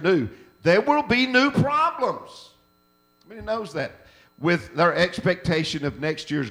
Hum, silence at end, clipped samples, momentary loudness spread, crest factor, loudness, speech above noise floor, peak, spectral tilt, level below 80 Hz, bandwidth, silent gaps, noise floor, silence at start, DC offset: none; 0 s; under 0.1%; 12 LU; 20 dB; -22 LUFS; 40 dB; -4 dBFS; -6 dB/octave; -52 dBFS; 16 kHz; none; -63 dBFS; 0 s; under 0.1%